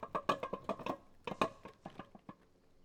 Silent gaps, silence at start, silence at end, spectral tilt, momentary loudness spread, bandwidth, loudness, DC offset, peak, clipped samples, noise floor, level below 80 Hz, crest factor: none; 0 s; 0.5 s; -5 dB/octave; 18 LU; 18 kHz; -41 LUFS; under 0.1%; -18 dBFS; under 0.1%; -66 dBFS; -68 dBFS; 24 dB